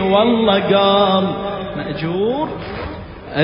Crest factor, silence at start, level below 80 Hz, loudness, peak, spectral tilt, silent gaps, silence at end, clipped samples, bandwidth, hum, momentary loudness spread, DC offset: 16 dB; 0 s; -40 dBFS; -17 LUFS; -2 dBFS; -11 dB/octave; none; 0 s; under 0.1%; 5.4 kHz; none; 14 LU; under 0.1%